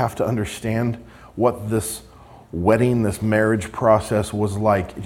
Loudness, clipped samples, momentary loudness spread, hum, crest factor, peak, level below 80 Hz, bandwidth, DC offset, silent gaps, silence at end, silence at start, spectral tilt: -21 LUFS; under 0.1%; 10 LU; none; 18 dB; -2 dBFS; -46 dBFS; 16.5 kHz; under 0.1%; none; 0 s; 0 s; -6.5 dB/octave